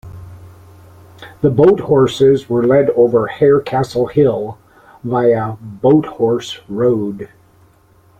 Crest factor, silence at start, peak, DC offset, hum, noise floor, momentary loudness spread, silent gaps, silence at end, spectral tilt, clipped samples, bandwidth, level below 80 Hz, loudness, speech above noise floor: 14 dB; 0.05 s; -2 dBFS; under 0.1%; none; -50 dBFS; 13 LU; none; 0.95 s; -7.5 dB/octave; under 0.1%; 9.4 kHz; -48 dBFS; -14 LUFS; 36 dB